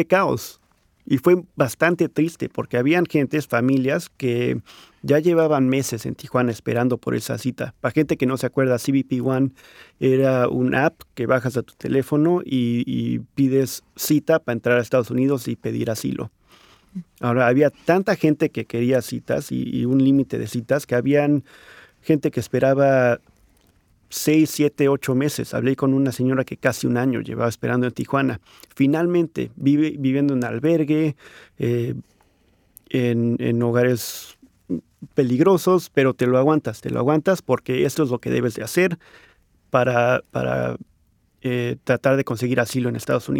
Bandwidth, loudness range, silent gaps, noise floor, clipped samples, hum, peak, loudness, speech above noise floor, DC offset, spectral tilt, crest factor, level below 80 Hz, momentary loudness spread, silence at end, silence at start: 18.5 kHz; 3 LU; none; -62 dBFS; under 0.1%; none; -2 dBFS; -21 LUFS; 41 dB; under 0.1%; -6.5 dB/octave; 18 dB; -58 dBFS; 9 LU; 0 s; 0 s